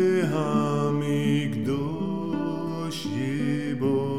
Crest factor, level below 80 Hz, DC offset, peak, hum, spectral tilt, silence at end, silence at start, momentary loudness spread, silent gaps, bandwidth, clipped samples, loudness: 14 dB; -60 dBFS; 0.5%; -12 dBFS; none; -7 dB/octave; 0 s; 0 s; 5 LU; none; 14.5 kHz; under 0.1%; -26 LUFS